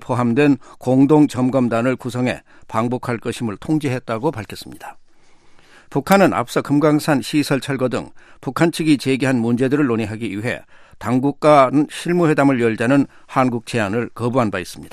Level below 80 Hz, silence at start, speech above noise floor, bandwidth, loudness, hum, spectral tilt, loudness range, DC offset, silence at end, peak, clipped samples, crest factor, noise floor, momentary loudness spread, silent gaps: -52 dBFS; 0 s; 28 dB; 15 kHz; -18 LUFS; none; -6.5 dB/octave; 6 LU; under 0.1%; 0 s; 0 dBFS; under 0.1%; 18 dB; -46 dBFS; 12 LU; none